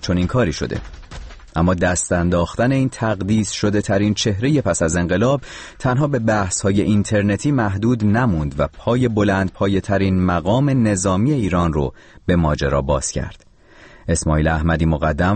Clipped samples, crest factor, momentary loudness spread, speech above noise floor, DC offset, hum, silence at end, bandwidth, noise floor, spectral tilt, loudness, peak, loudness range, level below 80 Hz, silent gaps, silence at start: under 0.1%; 12 dB; 7 LU; 28 dB; under 0.1%; none; 0 s; 8.8 kHz; -46 dBFS; -6 dB/octave; -18 LUFS; -6 dBFS; 2 LU; -32 dBFS; none; 0 s